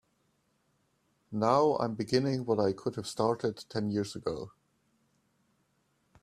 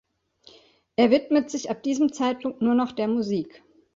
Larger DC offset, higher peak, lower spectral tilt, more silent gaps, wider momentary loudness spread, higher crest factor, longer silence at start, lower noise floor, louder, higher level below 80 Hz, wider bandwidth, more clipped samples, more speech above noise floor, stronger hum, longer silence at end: neither; second, -12 dBFS vs -6 dBFS; about the same, -6 dB/octave vs -5 dB/octave; neither; about the same, 11 LU vs 10 LU; about the same, 22 dB vs 18 dB; first, 1.3 s vs 1 s; first, -74 dBFS vs -56 dBFS; second, -31 LUFS vs -24 LUFS; about the same, -68 dBFS vs -64 dBFS; first, 14 kHz vs 7.6 kHz; neither; first, 44 dB vs 33 dB; neither; first, 1.75 s vs 0.45 s